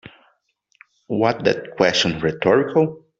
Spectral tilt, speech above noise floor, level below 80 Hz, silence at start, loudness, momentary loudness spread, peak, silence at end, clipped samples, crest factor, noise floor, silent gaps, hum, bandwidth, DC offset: -5 dB/octave; 47 dB; -54 dBFS; 1.1 s; -19 LUFS; 5 LU; -2 dBFS; 0.2 s; under 0.1%; 20 dB; -66 dBFS; none; none; 8 kHz; under 0.1%